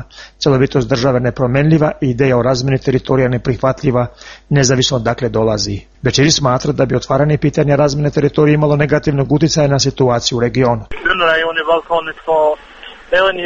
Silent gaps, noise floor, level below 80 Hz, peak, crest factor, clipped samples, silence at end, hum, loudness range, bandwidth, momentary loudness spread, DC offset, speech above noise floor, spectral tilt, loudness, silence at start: none; -36 dBFS; -36 dBFS; 0 dBFS; 14 dB; under 0.1%; 0 s; none; 2 LU; 7.6 kHz; 5 LU; under 0.1%; 22 dB; -5.5 dB/octave; -14 LUFS; 0 s